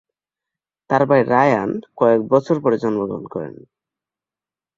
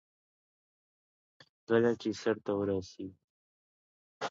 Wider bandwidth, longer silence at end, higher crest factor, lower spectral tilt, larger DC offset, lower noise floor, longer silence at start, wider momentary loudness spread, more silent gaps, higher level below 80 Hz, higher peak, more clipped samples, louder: about the same, 7.4 kHz vs 7.6 kHz; first, 1.3 s vs 0 s; about the same, 18 dB vs 22 dB; first, -8 dB/octave vs -6 dB/octave; neither; about the same, under -90 dBFS vs under -90 dBFS; second, 0.9 s vs 1.7 s; second, 13 LU vs 17 LU; second, none vs 3.24-4.21 s; first, -60 dBFS vs -66 dBFS; first, -2 dBFS vs -14 dBFS; neither; first, -18 LUFS vs -32 LUFS